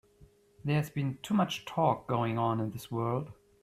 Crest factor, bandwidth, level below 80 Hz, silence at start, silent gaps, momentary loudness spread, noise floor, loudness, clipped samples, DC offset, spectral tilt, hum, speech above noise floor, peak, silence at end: 18 dB; 14.5 kHz; -64 dBFS; 0.2 s; none; 7 LU; -61 dBFS; -32 LUFS; under 0.1%; under 0.1%; -7 dB/octave; none; 30 dB; -14 dBFS; 0.3 s